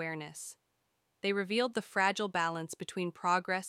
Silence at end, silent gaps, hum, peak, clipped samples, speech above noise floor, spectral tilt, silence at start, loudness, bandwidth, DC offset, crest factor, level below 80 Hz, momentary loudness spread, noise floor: 0 s; none; none; -16 dBFS; under 0.1%; 45 dB; -4 dB/octave; 0 s; -33 LUFS; 16 kHz; under 0.1%; 20 dB; -82 dBFS; 11 LU; -79 dBFS